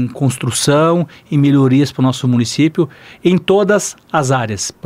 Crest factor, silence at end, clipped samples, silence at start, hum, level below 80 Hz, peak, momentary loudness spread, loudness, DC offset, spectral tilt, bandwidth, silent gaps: 12 dB; 0.15 s; under 0.1%; 0 s; none; -52 dBFS; -2 dBFS; 7 LU; -14 LUFS; under 0.1%; -5.5 dB/octave; 15.5 kHz; none